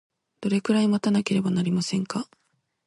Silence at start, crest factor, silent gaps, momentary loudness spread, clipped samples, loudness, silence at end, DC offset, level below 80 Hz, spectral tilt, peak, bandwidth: 0.4 s; 16 dB; none; 11 LU; under 0.1%; -25 LUFS; 0.65 s; under 0.1%; -66 dBFS; -6 dB/octave; -10 dBFS; 11.5 kHz